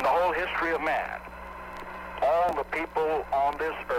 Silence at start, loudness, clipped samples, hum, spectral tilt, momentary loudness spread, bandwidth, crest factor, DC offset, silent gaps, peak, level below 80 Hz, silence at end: 0 s; -27 LUFS; under 0.1%; none; -5 dB/octave; 15 LU; 16 kHz; 14 dB; under 0.1%; none; -14 dBFS; -50 dBFS; 0 s